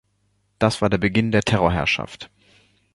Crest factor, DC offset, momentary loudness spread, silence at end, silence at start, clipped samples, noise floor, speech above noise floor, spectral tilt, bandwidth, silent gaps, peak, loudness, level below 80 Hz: 20 dB; under 0.1%; 16 LU; 0.7 s; 0.6 s; under 0.1%; -67 dBFS; 47 dB; -5.5 dB/octave; 11.5 kHz; none; -2 dBFS; -20 LUFS; -42 dBFS